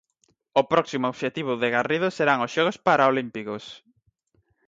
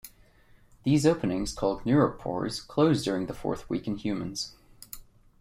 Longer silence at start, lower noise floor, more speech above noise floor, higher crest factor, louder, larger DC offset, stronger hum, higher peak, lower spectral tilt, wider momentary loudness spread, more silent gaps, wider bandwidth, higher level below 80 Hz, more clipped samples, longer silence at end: first, 0.55 s vs 0.05 s; first, -69 dBFS vs -58 dBFS; first, 46 dB vs 31 dB; about the same, 18 dB vs 20 dB; first, -23 LUFS vs -28 LUFS; neither; neither; about the same, -6 dBFS vs -8 dBFS; about the same, -5 dB/octave vs -6 dB/octave; second, 13 LU vs 18 LU; neither; second, 7.8 kHz vs 16 kHz; second, -68 dBFS vs -50 dBFS; neither; first, 0.9 s vs 0.4 s